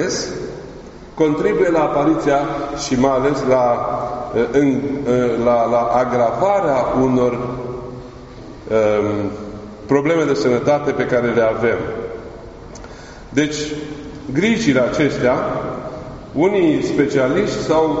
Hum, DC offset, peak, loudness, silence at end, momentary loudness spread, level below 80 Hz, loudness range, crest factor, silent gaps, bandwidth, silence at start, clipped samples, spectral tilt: none; under 0.1%; 0 dBFS; -17 LUFS; 0 s; 17 LU; -42 dBFS; 4 LU; 16 dB; none; 8 kHz; 0 s; under 0.1%; -5.5 dB/octave